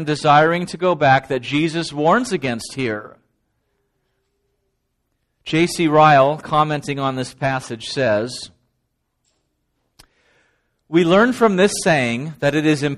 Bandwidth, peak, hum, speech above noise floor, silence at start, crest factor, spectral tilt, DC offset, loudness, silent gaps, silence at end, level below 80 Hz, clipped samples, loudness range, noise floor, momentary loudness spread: 13 kHz; 0 dBFS; none; 55 dB; 0 s; 18 dB; -5 dB/octave; under 0.1%; -17 LUFS; none; 0 s; -52 dBFS; under 0.1%; 9 LU; -72 dBFS; 11 LU